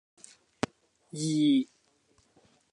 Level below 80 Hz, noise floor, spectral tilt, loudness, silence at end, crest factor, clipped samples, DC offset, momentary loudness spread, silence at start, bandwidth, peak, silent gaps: -68 dBFS; -68 dBFS; -5 dB/octave; -30 LUFS; 1.1 s; 22 dB; under 0.1%; under 0.1%; 16 LU; 1.15 s; 11 kHz; -10 dBFS; none